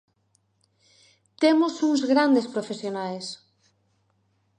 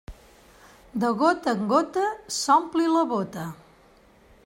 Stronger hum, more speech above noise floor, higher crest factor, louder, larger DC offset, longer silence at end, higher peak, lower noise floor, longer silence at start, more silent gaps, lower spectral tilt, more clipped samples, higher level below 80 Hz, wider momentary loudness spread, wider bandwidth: neither; first, 46 dB vs 32 dB; about the same, 18 dB vs 18 dB; about the same, -23 LUFS vs -24 LUFS; neither; first, 1.25 s vs 0.9 s; about the same, -8 dBFS vs -8 dBFS; first, -69 dBFS vs -56 dBFS; first, 1.4 s vs 0.1 s; neither; about the same, -4.5 dB/octave vs -4.5 dB/octave; neither; second, -80 dBFS vs -56 dBFS; about the same, 14 LU vs 13 LU; second, 10 kHz vs 16 kHz